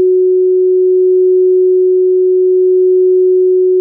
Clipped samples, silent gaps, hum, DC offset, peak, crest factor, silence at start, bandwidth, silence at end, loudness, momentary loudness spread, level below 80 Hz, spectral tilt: under 0.1%; none; none; under 0.1%; -6 dBFS; 4 dB; 0 s; 0.5 kHz; 0 s; -9 LUFS; 1 LU; under -90 dBFS; -16 dB/octave